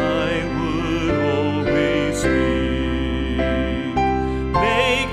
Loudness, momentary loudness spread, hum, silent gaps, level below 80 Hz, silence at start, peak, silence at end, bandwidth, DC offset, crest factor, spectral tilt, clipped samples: -20 LUFS; 5 LU; none; none; -30 dBFS; 0 s; -6 dBFS; 0 s; 13 kHz; under 0.1%; 14 dB; -6 dB/octave; under 0.1%